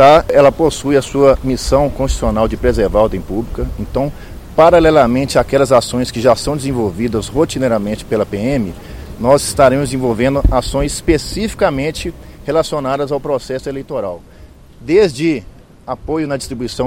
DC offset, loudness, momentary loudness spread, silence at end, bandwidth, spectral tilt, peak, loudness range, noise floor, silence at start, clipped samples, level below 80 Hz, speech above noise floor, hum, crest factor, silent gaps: under 0.1%; -14 LUFS; 12 LU; 0 s; 16.5 kHz; -5.5 dB/octave; 0 dBFS; 6 LU; -39 dBFS; 0 s; 0.3%; -26 dBFS; 25 dB; none; 14 dB; none